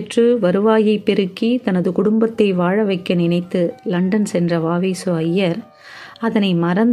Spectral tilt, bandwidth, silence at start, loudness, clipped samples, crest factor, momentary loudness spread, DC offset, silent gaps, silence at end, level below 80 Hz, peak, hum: -7 dB/octave; 12 kHz; 0 s; -17 LUFS; under 0.1%; 16 dB; 6 LU; under 0.1%; none; 0 s; -60 dBFS; -2 dBFS; none